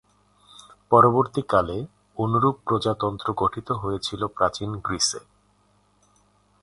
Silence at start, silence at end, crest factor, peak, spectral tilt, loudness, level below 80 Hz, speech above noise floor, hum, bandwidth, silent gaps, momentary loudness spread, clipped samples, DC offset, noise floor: 0.9 s; 1.45 s; 22 dB; -2 dBFS; -5 dB/octave; -23 LUFS; -50 dBFS; 40 dB; 50 Hz at -50 dBFS; 11.5 kHz; none; 12 LU; under 0.1%; under 0.1%; -63 dBFS